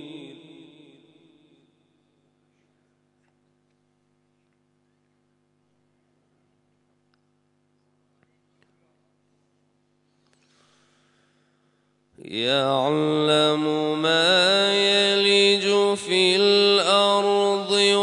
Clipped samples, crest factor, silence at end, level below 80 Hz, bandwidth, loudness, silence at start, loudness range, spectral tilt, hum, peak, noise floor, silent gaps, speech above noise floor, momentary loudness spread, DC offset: under 0.1%; 20 dB; 0 s; -80 dBFS; 11 kHz; -19 LUFS; 0 s; 11 LU; -3.5 dB/octave; 50 Hz at -60 dBFS; -6 dBFS; -68 dBFS; none; 47 dB; 6 LU; under 0.1%